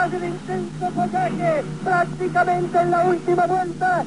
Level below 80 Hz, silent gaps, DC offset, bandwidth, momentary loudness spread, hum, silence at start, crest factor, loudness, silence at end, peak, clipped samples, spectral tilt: -54 dBFS; none; 0.4%; 10.5 kHz; 7 LU; none; 0 s; 14 dB; -21 LUFS; 0 s; -8 dBFS; under 0.1%; -7 dB/octave